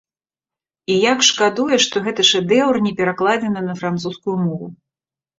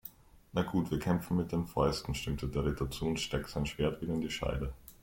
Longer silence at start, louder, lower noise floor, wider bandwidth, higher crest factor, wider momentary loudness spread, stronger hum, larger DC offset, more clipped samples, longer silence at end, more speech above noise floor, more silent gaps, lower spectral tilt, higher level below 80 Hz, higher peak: first, 0.9 s vs 0.05 s; first, -17 LUFS vs -35 LUFS; first, under -90 dBFS vs -54 dBFS; second, 8 kHz vs 16.5 kHz; about the same, 18 dB vs 18 dB; first, 10 LU vs 5 LU; neither; neither; neither; first, 0.65 s vs 0.1 s; first, over 73 dB vs 20 dB; neither; second, -3.5 dB/octave vs -6 dB/octave; second, -60 dBFS vs -46 dBFS; first, -2 dBFS vs -16 dBFS